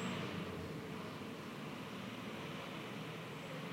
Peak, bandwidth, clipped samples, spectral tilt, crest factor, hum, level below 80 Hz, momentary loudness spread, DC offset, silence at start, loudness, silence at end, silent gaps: -30 dBFS; 16 kHz; under 0.1%; -5.5 dB/octave; 16 dB; none; -72 dBFS; 4 LU; under 0.1%; 0 s; -46 LUFS; 0 s; none